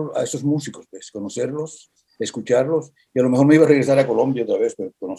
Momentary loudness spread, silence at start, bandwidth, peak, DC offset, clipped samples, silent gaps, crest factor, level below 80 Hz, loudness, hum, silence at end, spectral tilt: 18 LU; 0 s; 12 kHz; -2 dBFS; under 0.1%; under 0.1%; none; 18 dB; -66 dBFS; -19 LUFS; none; 0 s; -6.5 dB/octave